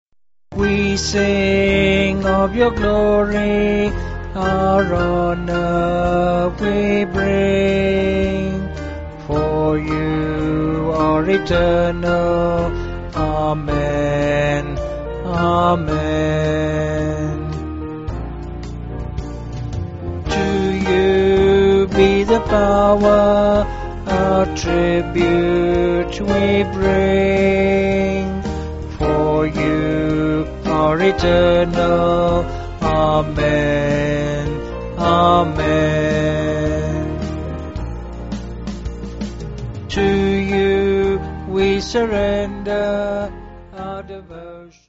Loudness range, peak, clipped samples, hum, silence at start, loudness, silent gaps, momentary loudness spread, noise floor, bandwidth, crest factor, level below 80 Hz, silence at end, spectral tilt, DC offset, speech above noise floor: 6 LU; 0 dBFS; under 0.1%; none; 0.5 s; -17 LUFS; none; 14 LU; -37 dBFS; 8 kHz; 16 dB; -30 dBFS; 0.2 s; -5.5 dB/octave; under 0.1%; 21 dB